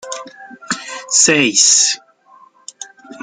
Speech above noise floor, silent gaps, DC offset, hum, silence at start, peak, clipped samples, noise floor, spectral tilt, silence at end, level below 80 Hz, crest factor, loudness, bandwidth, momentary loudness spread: 34 dB; none; under 0.1%; none; 0.05 s; 0 dBFS; under 0.1%; -47 dBFS; -0.5 dB/octave; 0 s; -64 dBFS; 18 dB; -12 LUFS; 11 kHz; 24 LU